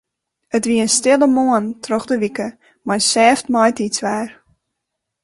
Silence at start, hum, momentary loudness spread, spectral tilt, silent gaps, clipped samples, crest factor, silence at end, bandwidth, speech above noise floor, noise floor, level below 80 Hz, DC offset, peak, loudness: 0.55 s; none; 12 LU; -3 dB/octave; none; under 0.1%; 18 dB; 0.9 s; 11.5 kHz; 62 dB; -78 dBFS; -58 dBFS; under 0.1%; 0 dBFS; -16 LUFS